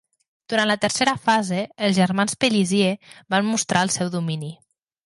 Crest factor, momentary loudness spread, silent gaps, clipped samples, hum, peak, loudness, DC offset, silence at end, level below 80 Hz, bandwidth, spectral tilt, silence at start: 18 dB; 7 LU; none; under 0.1%; none; -4 dBFS; -21 LUFS; under 0.1%; 0.5 s; -64 dBFS; 11.5 kHz; -4 dB/octave; 0.5 s